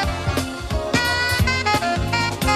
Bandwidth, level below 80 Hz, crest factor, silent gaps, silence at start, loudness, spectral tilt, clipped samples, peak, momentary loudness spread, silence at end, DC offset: 14 kHz; -32 dBFS; 16 dB; none; 0 s; -20 LUFS; -4 dB/octave; under 0.1%; -6 dBFS; 7 LU; 0 s; under 0.1%